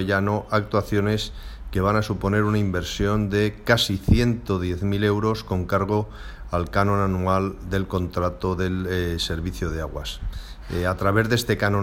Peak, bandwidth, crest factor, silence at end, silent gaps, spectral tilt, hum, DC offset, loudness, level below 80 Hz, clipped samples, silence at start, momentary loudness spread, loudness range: -4 dBFS; 16.5 kHz; 20 dB; 0 s; none; -6 dB/octave; none; under 0.1%; -23 LUFS; -36 dBFS; under 0.1%; 0 s; 10 LU; 4 LU